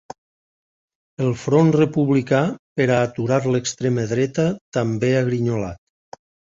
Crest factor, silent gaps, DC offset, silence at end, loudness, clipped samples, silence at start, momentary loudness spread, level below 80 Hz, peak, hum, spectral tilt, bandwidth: 18 dB; 2.59-2.76 s, 4.61-4.72 s; under 0.1%; 0.75 s; -20 LUFS; under 0.1%; 1.2 s; 7 LU; -52 dBFS; -4 dBFS; none; -6.5 dB/octave; 7.8 kHz